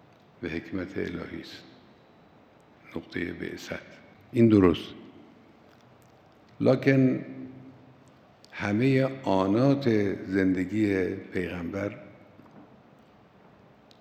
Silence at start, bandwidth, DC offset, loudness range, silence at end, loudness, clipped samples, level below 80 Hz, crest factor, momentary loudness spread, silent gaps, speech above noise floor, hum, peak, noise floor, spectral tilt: 0.4 s; 9 kHz; under 0.1%; 12 LU; 1.4 s; -27 LUFS; under 0.1%; -64 dBFS; 22 dB; 20 LU; none; 31 dB; none; -6 dBFS; -57 dBFS; -8 dB/octave